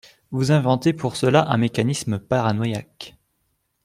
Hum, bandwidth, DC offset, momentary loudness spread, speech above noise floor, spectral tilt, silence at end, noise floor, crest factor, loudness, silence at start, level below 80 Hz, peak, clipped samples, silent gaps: none; 15 kHz; under 0.1%; 13 LU; 51 dB; -6 dB/octave; 0.75 s; -71 dBFS; 20 dB; -21 LUFS; 0.3 s; -56 dBFS; -2 dBFS; under 0.1%; none